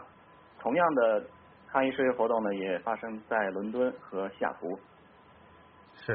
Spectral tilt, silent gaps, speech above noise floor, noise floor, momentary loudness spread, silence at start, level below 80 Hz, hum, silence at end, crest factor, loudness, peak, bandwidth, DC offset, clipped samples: -4 dB/octave; none; 27 dB; -57 dBFS; 12 LU; 0 s; -72 dBFS; none; 0 s; 20 dB; -30 LUFS; -12 dBFS; 4.5 kHz; under 0.1%; under 0.1%